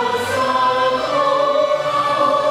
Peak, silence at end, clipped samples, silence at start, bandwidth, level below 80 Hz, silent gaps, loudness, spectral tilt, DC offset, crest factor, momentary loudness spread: -4 dBFS; 0 s; under 0.1%; 0 s; 15.5 kHz; -54 dBFS; none; -17 LUFS; -3.5 dB/octave; under 0.1%; 12 dB; 2 LU